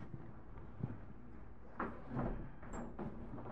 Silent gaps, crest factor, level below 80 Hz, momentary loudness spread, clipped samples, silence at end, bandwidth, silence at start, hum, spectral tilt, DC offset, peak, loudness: none; 22 dB; -54 dBFS; 13 LU; under 0.1%; 0 s; 8.4 kHz; 0 s; none; -8.5 dB/octave; 0.3%; -26 dBFS; -48 LUFS